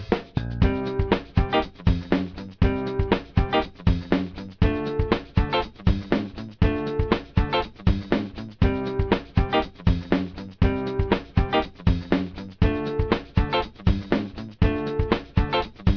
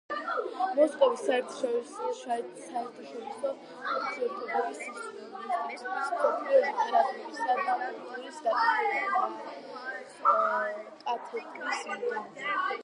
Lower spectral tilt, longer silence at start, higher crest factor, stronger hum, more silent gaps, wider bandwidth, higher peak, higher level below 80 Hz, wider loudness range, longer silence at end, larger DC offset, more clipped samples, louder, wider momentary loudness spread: first, -8.5 dB/octave vs -2.5 dB/octave; about the same, 0 s vs 0.1 s; about the same, 18 dB vs 20 dB; neither; neither; second, 5.4 kHz vs 11.5 kHz; first, -6 dBFS vs -10 dBFS; first, -30 dBFS vs under -90 dBFS; second, 1 LU vs 6 LU; about the same, 0 s vs 0 s; neither; neither; first, -25 LUFS vs -30 LUFS; second, 3 LU vs 14 LU